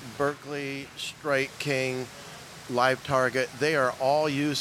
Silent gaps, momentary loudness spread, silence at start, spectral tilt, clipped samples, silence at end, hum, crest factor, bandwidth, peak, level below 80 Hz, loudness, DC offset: none; 11 LU; 0 s; -4.5 dB/octave; under 0.1%; 0 s; none; 20 dB; 16.5 kHz; -8 dBFS; -64 dBFS; -27 LUFS; under 0.1%